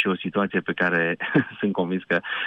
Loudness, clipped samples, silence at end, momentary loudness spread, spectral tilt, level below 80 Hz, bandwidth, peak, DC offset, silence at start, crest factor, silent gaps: -24 LUFS; under 0.1%; 0 s; 4 LU; -8 dB/octave; -66 dBFS; 5.8 kHz; -6 dBFS; under 0.1%; 0 s; 18 dB; none